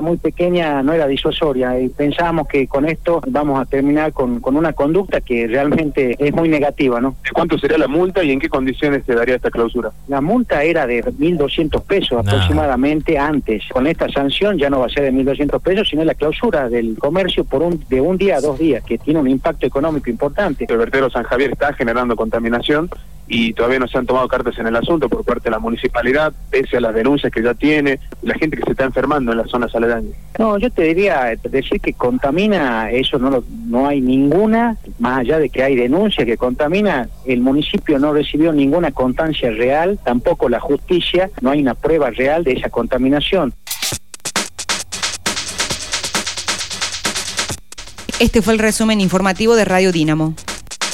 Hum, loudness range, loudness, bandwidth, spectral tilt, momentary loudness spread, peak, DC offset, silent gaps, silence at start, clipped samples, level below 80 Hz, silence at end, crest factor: none; 2 LU; -16 LUFS; 16.5 kHz; -5 dB/octave; 5 LU; -2 dBFS; 2%; none; 0 s; under 0.1%; -34 dBFS; 0 s; 14 dB